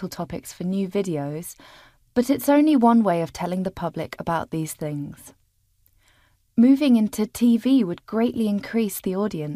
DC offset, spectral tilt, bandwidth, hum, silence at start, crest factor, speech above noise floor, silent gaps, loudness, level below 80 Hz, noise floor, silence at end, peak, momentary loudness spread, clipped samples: under 0.1%; -6.5 dB/octave; 15.5 kHz; none; 0 s; 16 dB; 42 dB; none; -22 LUFS; -56 dBFS; -64 dBFS; 0 s; -6 dBFS; 14 LU; under 0.1%